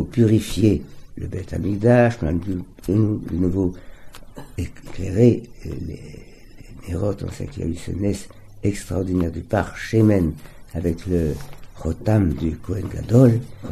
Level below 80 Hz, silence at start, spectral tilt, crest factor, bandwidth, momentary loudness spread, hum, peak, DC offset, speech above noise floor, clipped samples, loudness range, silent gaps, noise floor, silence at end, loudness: -38 dBFS; 0 s; -8 dB/octave; 20 dB; 13.5 kHz; 17 LU; none; -2 dBFS; under 0.1%; 20 dB; under 0.1%; 5 LU; none; -41 dBFS; 0 s; -21 LUFS